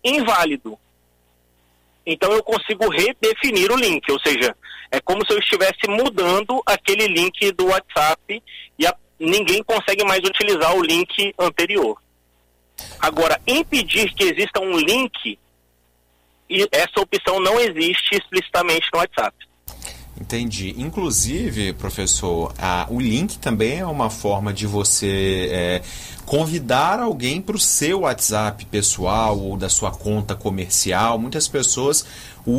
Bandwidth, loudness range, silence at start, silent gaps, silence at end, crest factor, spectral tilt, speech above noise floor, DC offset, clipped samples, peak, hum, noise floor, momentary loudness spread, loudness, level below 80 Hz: 16 kHz; 3 LU; 0.05 s; none; 0 s; 14 dB; -3 dB/octave; 41 dB; under 0.1%; under 0.1%; -6 dBFS; 60 Hz at -55 dBFS; -61 dBFS; 9 LU; -19 LUFS; -40 dBFS